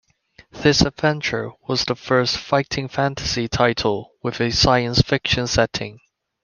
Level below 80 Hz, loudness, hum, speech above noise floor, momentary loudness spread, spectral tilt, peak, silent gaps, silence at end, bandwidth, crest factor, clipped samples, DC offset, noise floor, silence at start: -38 dBFS; -20 LUFS; none; 33 dB; 8 LU; -4.5 dB/octave; -2 dBFS; none; 0.45 s; 10 kHz; 20 dB; under 0.1%; under 0.1%; -53 dBFS; 0.55 s